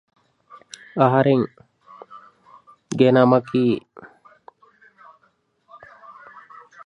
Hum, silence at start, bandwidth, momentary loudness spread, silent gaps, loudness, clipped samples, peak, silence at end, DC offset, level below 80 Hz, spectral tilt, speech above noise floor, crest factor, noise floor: none; 0.95 s; 10.5 kHz; 27 LU; none; -19 LUFS; under 0.1%; -2 dBFS; 2.8 s; under 0.1%; -66 dBFS; -7.5 dB/octave; 48 dB; 22 dB; -64 dBFS